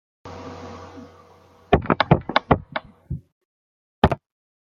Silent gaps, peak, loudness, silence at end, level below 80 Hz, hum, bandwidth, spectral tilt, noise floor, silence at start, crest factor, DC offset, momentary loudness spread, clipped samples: 3.32-4.02 s; -2 dBFS; -22 LUFS; 0.55 s; -40 dBFS; none; 7.2 kHz; -8 dB/octave; -52 dBFS; 0.25 s; 24 dB; under 0.1%; 21 LU; under 0.1%